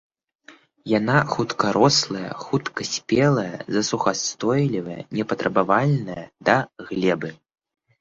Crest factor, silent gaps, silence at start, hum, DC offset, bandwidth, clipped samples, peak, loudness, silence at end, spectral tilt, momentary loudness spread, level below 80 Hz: 20 dB; none; 0.5 s; none; under 0.1%; 8 kHz; under 0.1%; -4 dBFS; -22 LUFS; 0.65 s; -4.5 dB/octave; 10 LU; -58 dBFS